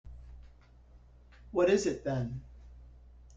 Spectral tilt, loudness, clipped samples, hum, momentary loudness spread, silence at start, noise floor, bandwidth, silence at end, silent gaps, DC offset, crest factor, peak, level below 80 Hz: -6 dB/octave; -31 LUFS; under 0.1%; none; 27 LU; 0.05 s; -57 dBFS; 9.2 kHz; 0.3 s; none; under 0.1%; 20 dB; -14 dBFS; -52 dBFS